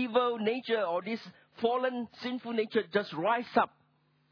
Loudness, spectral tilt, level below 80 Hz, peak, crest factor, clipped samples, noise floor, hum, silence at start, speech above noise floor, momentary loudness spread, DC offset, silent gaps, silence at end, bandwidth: -32 LUFS; -6.5 dB/octave; -80 dBFS; -12 dBFS; 20 dB; under 0.1%; -70 dBFS; none; 0 s; 39 dB; 9 LU; under 0.1%; none; 0.65 s; 5.4 kHz